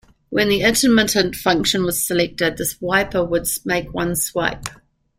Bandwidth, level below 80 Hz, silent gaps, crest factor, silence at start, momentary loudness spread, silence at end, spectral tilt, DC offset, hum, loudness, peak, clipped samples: 16 kHz; -42 dBFS; none; 18 dB; 0.3 s; 8 LU; 0.45 s; -3 dB/octave; under 0.1%; none; -18 LUFS; -2 dBFS; under 0.1%